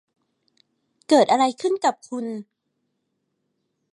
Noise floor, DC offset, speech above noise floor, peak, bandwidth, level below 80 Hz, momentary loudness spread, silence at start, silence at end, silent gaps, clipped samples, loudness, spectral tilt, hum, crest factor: -75 dBFS; under 0.1%; 55 dB; -4 dBFS; 11.5 kHz; -80 dBFS; 15 LU; 1.1 s; 1.5 s; none; under 0.1%; -21 LUFS; -3.5 dB/octave; none; 20 dB